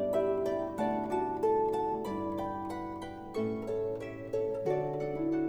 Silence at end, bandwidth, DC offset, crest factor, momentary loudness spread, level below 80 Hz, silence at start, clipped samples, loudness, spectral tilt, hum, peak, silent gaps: 0 s; 15 kHz; under 0.1%; 14 dB; 9 LU; -60 dBFS; 0 s; under 0.1%; -34 LUFS; -7.5 dB/octave; none; -18 dBFS; none